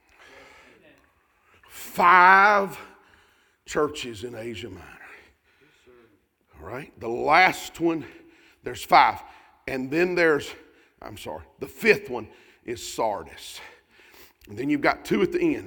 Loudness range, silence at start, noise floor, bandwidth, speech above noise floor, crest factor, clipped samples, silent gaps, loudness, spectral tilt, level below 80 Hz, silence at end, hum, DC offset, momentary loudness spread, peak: 13 LU; 1.75 s; -63 dBFS; 19.5 kHz; 40 dB; 24 dB; under 0.1%; none; -21 LUFS; -4.5 dB/octave; -58 dBFS; 0 s; none; under 0.1%; 23 LU; -2 dBFS